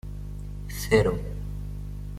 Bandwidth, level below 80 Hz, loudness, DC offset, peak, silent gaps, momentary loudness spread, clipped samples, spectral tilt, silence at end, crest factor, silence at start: 16 kHz; -36 dBFS; -28 LUFS; under 0.1%; -8 dBFS; none; 16 LU; under 0.1%; -6 dB/octave; 0 s; 20 dB; 0.05 s